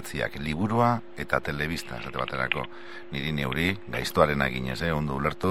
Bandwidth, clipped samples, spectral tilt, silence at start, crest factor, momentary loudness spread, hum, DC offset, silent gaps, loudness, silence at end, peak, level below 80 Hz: 16 kHz; under 0.1%; -5.5 dB/octave; 0 s; 22 dB; 9 LU; none; 0.9%; none; -28 LUFS; 0 s; -4 dBFS; -46 dBFS